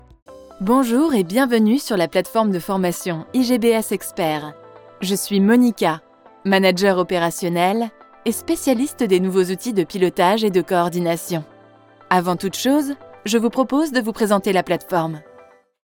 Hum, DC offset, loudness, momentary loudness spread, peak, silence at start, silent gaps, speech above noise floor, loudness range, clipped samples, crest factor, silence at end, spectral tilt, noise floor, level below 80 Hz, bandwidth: none; under 0.1%; -19 LUFS; 10 LU; -2 dBFS; 0.3 s; none; 30 dB; 2 LU; under 0.1%; 18 dB; 0.65 s; -5 dB/octave; -48 dBFS; -56 dBFS; over 20 kHz